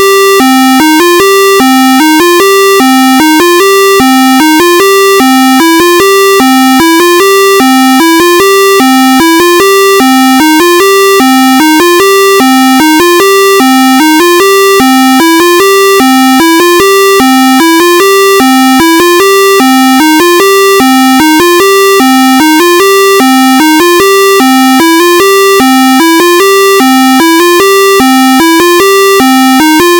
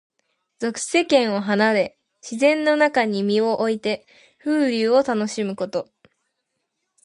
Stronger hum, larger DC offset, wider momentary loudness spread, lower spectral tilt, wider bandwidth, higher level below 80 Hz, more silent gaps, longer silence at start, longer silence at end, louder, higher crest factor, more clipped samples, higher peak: neither; neither; second, 0 LU vs 12 LU; second, -2 dB/octave vs -4.5 dB/octave; first, over 20 kHz vs 11.5 kHz; first, -42 dBFS vs -68 dBFS; neither; second, 0 s vs 0.6 s; second, 0 s vs 1.2 s; first, -3 LUFS vs -21 LUFS; second, 4 dB vs 18 dB; first, 4% vs under 0.1%; first, 0 dBFS vs -4 dBFS